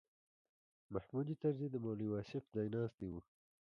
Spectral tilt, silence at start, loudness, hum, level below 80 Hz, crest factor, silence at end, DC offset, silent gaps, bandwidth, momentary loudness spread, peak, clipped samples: -10 dB/octave; 0.9 s; -43 LUFS; none; -70 dBFS; 18 dB; 0.4 s; under 0.1%; 2.94-2.98 s; 6.8 kHz; 9 LU; -26 dBFS; under 0.1%